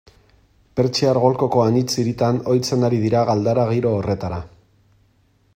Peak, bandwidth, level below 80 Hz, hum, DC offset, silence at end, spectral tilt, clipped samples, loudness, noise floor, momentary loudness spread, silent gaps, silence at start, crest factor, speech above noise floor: -2 dBFS; 15.5 kHz; -52 dBFS; none; under 0.1%; 1.1 s; -6.5 dB/octave; under 0.1%; -19 LUFS; -59 dBFS; 7 LU; none; 0.75 s; 18 dB; 41 dB